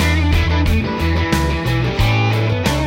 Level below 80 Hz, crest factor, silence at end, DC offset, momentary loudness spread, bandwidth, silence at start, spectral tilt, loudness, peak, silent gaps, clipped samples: -22 dBFS; 14 dB; 0 s; under 0.1%; 3 LU; 16 kHz; 0 s; -6 dB/octave; -17 LUFS; -2 dBFS; none; under 0.1%